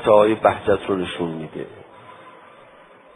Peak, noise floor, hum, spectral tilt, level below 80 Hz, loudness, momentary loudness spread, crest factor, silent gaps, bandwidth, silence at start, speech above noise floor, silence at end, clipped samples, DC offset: -2 dBFS; -48 dBFS; none; -6.5 dB/octave; -54 dBFS; -20 LUFS; 19 LU; 20 dB; none; 11.5 kHz; 0 s; 29 dB; 0.85 s; under 0.1%; under 0.1%